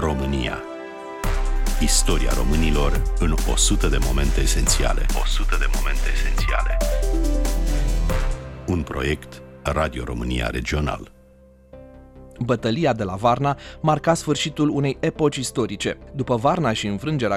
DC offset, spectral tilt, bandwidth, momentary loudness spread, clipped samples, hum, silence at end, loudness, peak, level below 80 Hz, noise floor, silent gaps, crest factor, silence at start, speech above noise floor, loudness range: under 0.1%; -4.5 dB/octave; 16.5 kHz; 8 LU; under 0.1%; none; 0 s; -23 LUFS; -4 dBFS; -24 dBFS; -50 dBFS; none; 16 dB; 0 s; 30 dB; 5 LU